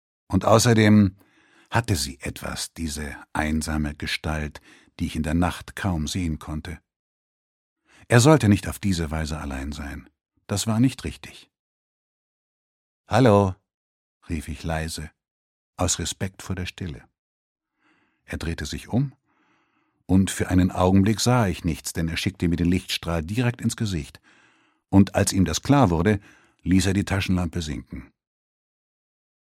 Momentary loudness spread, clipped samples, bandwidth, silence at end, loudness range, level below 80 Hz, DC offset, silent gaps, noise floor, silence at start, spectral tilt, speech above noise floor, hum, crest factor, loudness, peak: 16 LU; under 0.1%; 16 kHz; 1.45 s; 8 LU; -40 dBFS; under 0.1%; 6.96-7.76 s, 11.59-13.04 s, 13.74-14.21 s, 15.31-15.73 s, 17.19-17.56 s; -68 dBFS; 0.3 s; -5.5 dB/octave; 46 dB; none; 24 dB; -23 LUFS; -2 dBFS